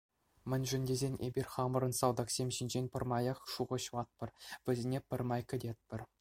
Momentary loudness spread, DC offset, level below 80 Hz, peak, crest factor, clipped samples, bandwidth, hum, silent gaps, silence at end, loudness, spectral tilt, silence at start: 10 LU; under 0.1%; -64 dBFS; -16 dBFS; 20 dB; under 0.1%; 16.5 kHz; none; none; 0.15 s; -38 LUFS; -5 dB/octave; 0.45 s